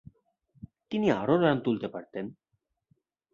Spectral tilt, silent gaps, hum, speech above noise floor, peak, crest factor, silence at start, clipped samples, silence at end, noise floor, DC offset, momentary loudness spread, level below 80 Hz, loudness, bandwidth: -8 dB/octave; none; none; 45 dB; -10 dBFS; 20 dB; 0.9 s; under 0.1%; 1 s; -72 dBFS; under 0.1%; 15 LU; -66 dBFS; -28 LUFS; 7.2 kHz